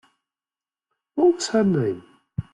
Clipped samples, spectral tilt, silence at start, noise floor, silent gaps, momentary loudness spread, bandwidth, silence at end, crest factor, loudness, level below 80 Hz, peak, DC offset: under 0.1%; -6 dB/octave; 1.15 s; under -90 dBFS; none; 15 LU; 11 kHz; 0.1 s; 16 dB; -21 LUFS; -56 dBFS; -8 dBFS; under 0.1%